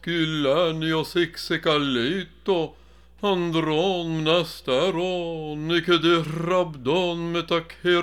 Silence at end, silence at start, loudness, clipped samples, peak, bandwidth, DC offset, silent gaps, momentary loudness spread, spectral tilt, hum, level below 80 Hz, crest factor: 0 s; 0.05 s; -24 LUFS; under 0.1%; -6 dBFS; 16 kHz; 0.2%; none; 6 LU; -5.5 dB/octave; none; -54 dBFS; 18 dB